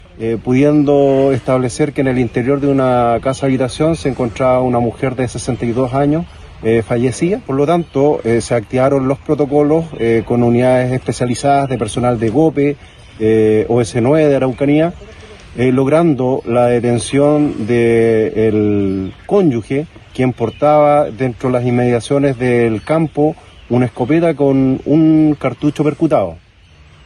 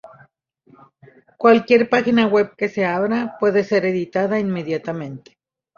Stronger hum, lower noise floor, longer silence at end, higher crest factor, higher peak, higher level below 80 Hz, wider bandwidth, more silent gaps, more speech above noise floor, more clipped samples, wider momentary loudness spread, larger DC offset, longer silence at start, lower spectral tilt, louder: neither; second, -44 dBFS vs -57 dBFS; about the same, 0.7 s vs 0.6 s; second, 14 dB vs 20 dB; about the same, 0 dBFS vs 0 dBFS; first, -40 dBFS vs -62 dBFS; first, 11 kHz vs 7 kHz; neither; second, 30 dB vs 39 dB; neither; second, 7 LU vs 10 LU; neither; about the same, 0.15 s vs 0.05 s; about the same, -7 dB/octave vs -7 dB/octave; first, -14 LUFS vs -18 LUFS